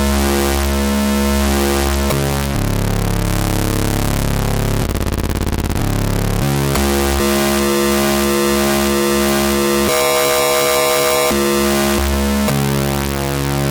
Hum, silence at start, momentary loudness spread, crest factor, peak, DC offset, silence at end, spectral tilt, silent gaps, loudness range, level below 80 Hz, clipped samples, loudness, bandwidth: none; 0 s; 5 LU; 14 dB; 0 dBFS; under 0.1%; 0 s; -4.5 dB/octave; none; 4 LU; -24 dBFS; under 0.1%; -16 LUFS; over 20 kHz